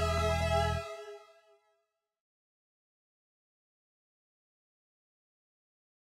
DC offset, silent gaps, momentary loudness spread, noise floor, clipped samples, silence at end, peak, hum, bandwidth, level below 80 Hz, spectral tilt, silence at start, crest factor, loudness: under 0.1%; none; 19 LU; -81 dBFS; under 0.1%; 4.9 s; -16 dBFS; none; 15 kHz; -48 dBFS; -5 dB/octave; 0 s; 22 dB; -32 LUFS